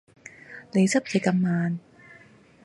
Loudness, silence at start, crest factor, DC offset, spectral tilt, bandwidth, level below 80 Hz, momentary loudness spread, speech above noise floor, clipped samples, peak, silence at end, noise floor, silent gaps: -25 LUFS; 0.5 s; 18 dB; under 0.1%; -6 dB/octave; 11.5 kHz; -70 dBFS; 21 LU; 30 dB; under 0.1%; -8 dBFS; 0.85 s; -53 dBFS; none